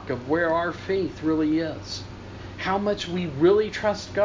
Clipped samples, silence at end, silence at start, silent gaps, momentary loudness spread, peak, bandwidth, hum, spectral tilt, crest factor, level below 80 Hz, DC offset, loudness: under 0.1%; 0 s; 0 s; none; 14 LU; -8 dBFS; 7.6 kHz; none; -6 dB/octave; 16 dB; -48 dBFS; under 0.1%; -25 LUFS